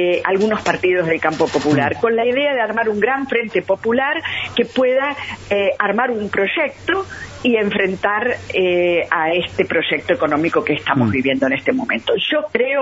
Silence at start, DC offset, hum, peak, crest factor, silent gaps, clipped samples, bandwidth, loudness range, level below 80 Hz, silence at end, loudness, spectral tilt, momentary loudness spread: 0 s; under 0.1%; none; 0 dBFS; 18 dB; none; under 0.1%; 8 kHz; 1 LU; -52 dBFS; 0 s; -17 LUFS; -5.5 dB/octave; 3 LU